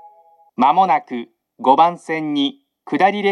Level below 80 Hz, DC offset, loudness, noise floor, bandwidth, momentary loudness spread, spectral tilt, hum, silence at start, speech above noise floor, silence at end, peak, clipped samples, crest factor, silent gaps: -82 dBFS; under 0.1%; -17 LUFS; -51 dBFS; 10 kHz; 14 LU; -5.5 dB/octave; none; 0.6 s; 34 dB; 0 s; 0 dBFS; under 0.1%; 18 dB; none